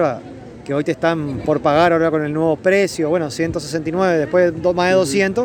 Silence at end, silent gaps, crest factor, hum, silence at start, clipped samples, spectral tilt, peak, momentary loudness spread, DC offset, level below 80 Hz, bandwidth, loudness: 0 s; none; 16 dB; none; 0 s; under 0.1%; -5.5 dB/octave; -2 dBFS; 8 LU; under 0.1%; -46 dBFS; 19 kHz; -17 LUFS